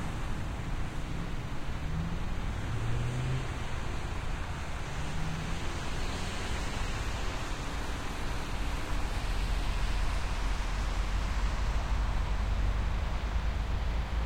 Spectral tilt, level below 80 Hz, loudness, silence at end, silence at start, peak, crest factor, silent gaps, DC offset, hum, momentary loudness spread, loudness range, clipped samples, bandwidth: -5 dB/octave; -34 dBFS; -36 LUFS; 0 s; 0 s; -20 dBFS; 12 dB; none; under 0.1%; none; 4 LU; 3 LU; under 0.1%; 15 kHz